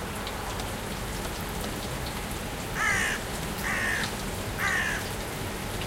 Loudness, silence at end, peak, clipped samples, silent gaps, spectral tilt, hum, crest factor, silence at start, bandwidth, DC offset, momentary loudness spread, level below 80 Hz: -30 LUFS; 0 s; -14 dBFS; under 0.1%; none; -3.5 dB/octave; none; 16 dB; 0 s; 17 kHz; under 0.1%; 8 LU; -40 dBFS